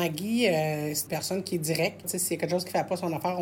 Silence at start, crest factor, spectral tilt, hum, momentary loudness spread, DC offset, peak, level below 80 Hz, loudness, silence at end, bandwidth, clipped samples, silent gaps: 0 s; 16 dB; -4 dB/octave; none; 5 LU; under 0.1%; -12 dBFS; -68 dBFS; -28 LUFS; 0 s; 17 kHz; under 0.1%; none